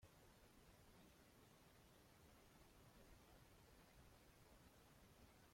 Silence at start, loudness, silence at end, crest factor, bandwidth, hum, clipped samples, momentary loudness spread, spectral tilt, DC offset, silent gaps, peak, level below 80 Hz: 0 s; -70 LUFS; 0 s; 16 dB; 16.5 kHz; none; under 0.1%; 1 LU; -4 dB/octave; under 0.1%; none; -54 dBFS; -76 dBFS